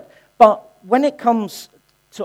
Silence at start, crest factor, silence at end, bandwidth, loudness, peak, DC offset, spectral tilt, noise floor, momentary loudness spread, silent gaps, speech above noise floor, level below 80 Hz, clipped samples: 0.4 s; 18 dB; 0 s; 15.5 kHz; -16 LUFS; 0 dBFS; under 0.1%; -5.5 dB/octave; -33 dBFS; 15 LU; none; 18 dB; -60 dBFS; 0.1%